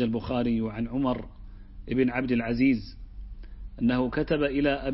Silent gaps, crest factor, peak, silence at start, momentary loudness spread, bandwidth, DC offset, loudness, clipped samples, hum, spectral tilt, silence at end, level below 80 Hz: none; 16 dB; -12 dBFS; 0 s; 21 LU; 5.8 kHz; under 0.1%; -27 LUFS; under 0.1%; none; -10.5 dB/octave; 0 s; -42 dBFS